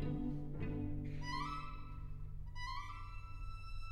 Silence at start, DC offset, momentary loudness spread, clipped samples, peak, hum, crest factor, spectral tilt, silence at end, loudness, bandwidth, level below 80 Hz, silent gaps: 0 s; under 0.1%; 9 LU; under 0.1%; -28 dBFS; none; 14 dB; -6.5 dB/octave; 0 s; -46 LUFS; 10 kHz; -46 dBFS; none